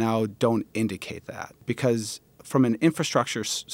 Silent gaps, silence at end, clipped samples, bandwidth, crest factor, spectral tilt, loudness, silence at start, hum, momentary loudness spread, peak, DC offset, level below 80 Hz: none; 0 s; under 0.1%; 16.5 kHz; 20 dB; -5 dB/octave; -26 LUFS; 0 s; none; 14 LU; -6 dBFS; under 0.1%; -66 dBFS